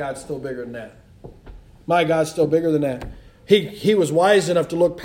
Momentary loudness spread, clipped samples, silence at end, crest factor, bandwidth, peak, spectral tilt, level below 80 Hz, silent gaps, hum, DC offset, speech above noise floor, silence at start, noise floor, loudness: 17 LU; under 0.1%; 0 s; 18 dB; 16 kHz; -2 dBFS; -5.5 dB/octave; -48 dBFS; none; none; under 0.1%; 23 dB; 0 s; -42 dBFS; -19 LUFS